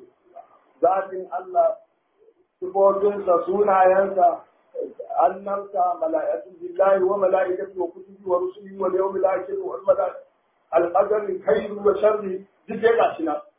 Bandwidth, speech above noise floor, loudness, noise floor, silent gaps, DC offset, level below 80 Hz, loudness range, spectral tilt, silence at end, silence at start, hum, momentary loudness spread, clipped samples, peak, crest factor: 3.8 kHz; 38 dB; -22 LUFS; -60 dBFS; none; under 0.1%; -66 dBFS; 3 LU; -9.5 dB/octave; 0.15 s; 0.35 s; none; 13 LU; under 0.1%; -6 dBFS; 16 dB